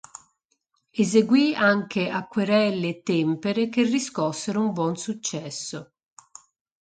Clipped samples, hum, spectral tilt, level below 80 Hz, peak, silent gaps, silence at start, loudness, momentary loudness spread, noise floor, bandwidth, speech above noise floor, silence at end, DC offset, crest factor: under 0.1%; none; -5 dB/octave; -68 dBFS; -6 dBFS; none; 0.95 s; -24 LUFS; 13 LU; -73 dBFS; 9.4 kHz; 50 dB; 1 s; under 0.1%; 18 dB